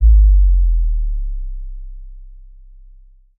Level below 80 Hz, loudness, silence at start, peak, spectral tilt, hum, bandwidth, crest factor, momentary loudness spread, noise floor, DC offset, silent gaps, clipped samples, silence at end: -14 dBFS; -17 LUFS; 0 s; -2 dBFS; -23.5 dB/octave; none; 0.2 kHz; 12 dB; 25 LU; -44 dBFS; under 0.1%; none; under 0.1%; 1.05 s